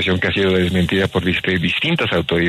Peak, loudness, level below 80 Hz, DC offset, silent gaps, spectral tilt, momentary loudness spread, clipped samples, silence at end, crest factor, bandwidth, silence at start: -4 dBFS; -17 LUFS; -40 dBFS; under 0.1%; none; -6 dB/octave; 2 LU; under 0.1%; 0 s; 14 dB; 14 kHz; 0 s